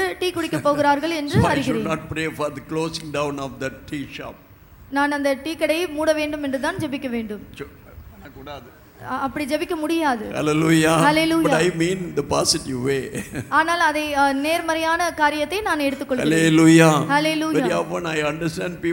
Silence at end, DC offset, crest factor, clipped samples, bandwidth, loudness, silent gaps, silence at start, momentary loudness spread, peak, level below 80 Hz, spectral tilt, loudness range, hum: 0 s; under 0.1%; 20 dB; under 0.1%; 17 kHz; -20 LUFS; none; 0 s; 14 LU; 0 dBFS; -48 dBFS; -5 dB/octave; 9 LU; none